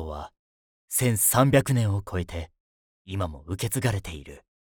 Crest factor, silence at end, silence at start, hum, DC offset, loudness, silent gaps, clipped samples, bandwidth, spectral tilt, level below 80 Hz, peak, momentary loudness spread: 20 dB; 0.3 s; 0 s; none; under 0.1%; -25 LUFS; 0.39-0.88 s, 2.60-3.05 s; under 0.1%; over 20 kHz; -5 dB/octave; -48 dBFS; -8 dBFS; 19 LU